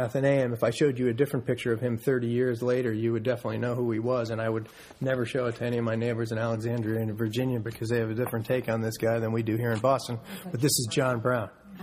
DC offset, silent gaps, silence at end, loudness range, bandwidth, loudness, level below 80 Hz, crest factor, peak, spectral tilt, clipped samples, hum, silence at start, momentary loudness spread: under 0.1%; none; 0 s; 2 LU; 15.5 kHz; -28 LUFS; -62 dBFS; 16 dB; -12 dBFS; -6 dB/octave; under 0.1%; none; 0 s; 5 LU